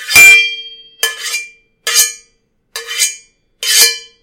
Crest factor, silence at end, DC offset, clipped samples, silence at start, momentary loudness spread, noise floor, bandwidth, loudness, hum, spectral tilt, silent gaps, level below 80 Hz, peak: 14 dB; 0.2 s; under 0.1%; 0.9%; 0 s; 22 LU; -59 dBFS; over 20 kHz; -9 LUFS; none; 2.5 dB/octave; none; -54 dBFS; 0 dBFS